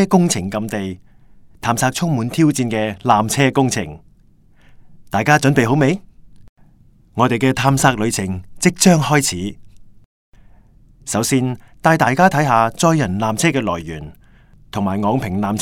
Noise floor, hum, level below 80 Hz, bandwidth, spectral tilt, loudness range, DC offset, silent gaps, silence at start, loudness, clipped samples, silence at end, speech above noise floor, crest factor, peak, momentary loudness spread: -49 dBFS; none; -48 dBFS; 17 kHz; -5 dB/octave; 3 LU; under 0.1%; 6.49-6.56 s, 10.05-10.32 s; 0 s; -17 LUFS; under 0.1%; 0 s; 33 dB; 18 dB; 0 dBFS; 13 LU